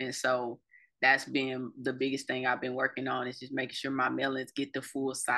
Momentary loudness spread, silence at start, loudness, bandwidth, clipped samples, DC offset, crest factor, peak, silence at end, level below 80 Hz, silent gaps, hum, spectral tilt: 9 LU; 0 s; -32 LUFS; 12.5 kHz; under 0.1%; under 0.1%; 20 dB; -12 dBFS; 0 s; -80 dBFS; none; none; -3.5 dB/octave